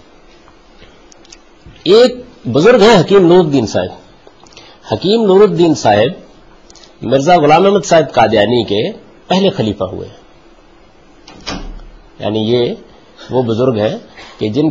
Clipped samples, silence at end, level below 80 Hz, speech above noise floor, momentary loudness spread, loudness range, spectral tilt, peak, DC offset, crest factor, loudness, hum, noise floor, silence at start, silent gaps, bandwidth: under 0.1%; 0 s; -42 dBFS; 34 dB; 17 LU; 9 LU; -6 dB/octave; 0 dBFS; 0.3%; 12 dB; -11 LUFS; none; -44 dBFS; 1.65 s; none; 8 kHz